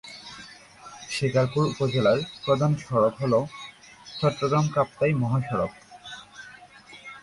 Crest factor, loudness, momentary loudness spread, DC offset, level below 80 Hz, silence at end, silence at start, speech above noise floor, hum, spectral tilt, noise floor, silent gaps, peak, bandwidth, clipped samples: 16 dB; -25 LUFS; 21 LU; under 0.1%; -58 dBFS; 0 s; 0.05 s; 25 dB; none; -6.5 dB/octave; -48 dBFS; none; -10 dBFS; 11.5 kHz; under 0.1%